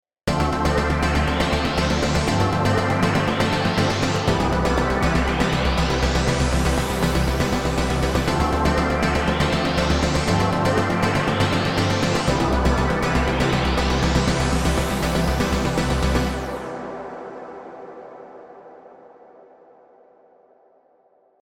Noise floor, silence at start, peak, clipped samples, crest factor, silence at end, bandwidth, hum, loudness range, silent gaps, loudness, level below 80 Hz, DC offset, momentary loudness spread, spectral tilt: -59 dBFS; 0.25 s; -4 dBFS; under 0.1%; 16 dB; 2.55 s; 16.5 kHz; none; 6 LU; none; -21 LUFS; -28 dBFS; under 0.1%; 9 LU; -5.5 dB/octave